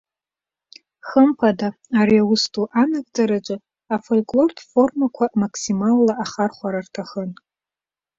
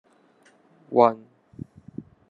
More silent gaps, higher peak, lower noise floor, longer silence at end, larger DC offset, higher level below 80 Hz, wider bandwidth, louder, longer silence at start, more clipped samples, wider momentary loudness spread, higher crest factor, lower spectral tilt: neither; about the same, -2 dBFS vs -2 dBFS; first, under -90 dBFS vs -59 dBFS; second, 0.85 s vs 1.15 s; neither; first, -62 dBFS vs -68 dBFS; about the same, 7.8 kHz vs 7.2 kHz; about the same, -20 LUFS vs -21 LUFS; first, 1.05 s vs 0.9 s; neither; second, 13 LU vs 23 LU; second, 18 dB vs 24 dB; second, -5.5 dB/octave vs -8.5 dB/octave